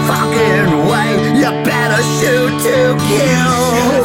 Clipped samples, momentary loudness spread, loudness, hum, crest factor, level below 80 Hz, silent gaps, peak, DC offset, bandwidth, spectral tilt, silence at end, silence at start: under 0.1%; 2 LU; -12 LUFS; none; 10 dB; -42 dBFS; none; -2 dBFS; 0.1%; 16.5 kHz; -5 dB/octave; 0 s; 0 s